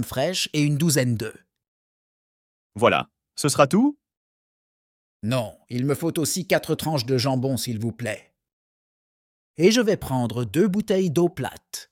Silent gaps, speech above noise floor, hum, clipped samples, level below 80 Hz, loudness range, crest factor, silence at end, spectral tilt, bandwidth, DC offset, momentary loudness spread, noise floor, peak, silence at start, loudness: 1.68-2.70 s, 4.17-5.20 s, 8.53-9.54 s; over 68 dB; none; under 0.1%; -58 dBFS; 3 LU; 20 dB; 0.1 s; -5 dB/octave; 17 kHz; under 0.1%; 13 LU; under -90 dBFS; -4 dBFS; 0 s; -23 LUFS